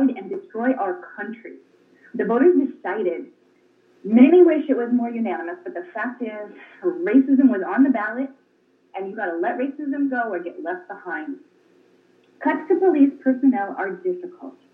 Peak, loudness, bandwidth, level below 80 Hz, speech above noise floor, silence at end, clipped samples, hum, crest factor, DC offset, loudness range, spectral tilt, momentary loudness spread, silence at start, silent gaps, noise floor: -2 dBFS; -21 LUFS; 3.6 kHz; under -90 dBFS; 41 dB; 0.25 s; under 0.1%; none; 20 dB; under 0.1%; 8 LU; -9 dB/octave; 17 LU; 0 s; none; -61 dBFS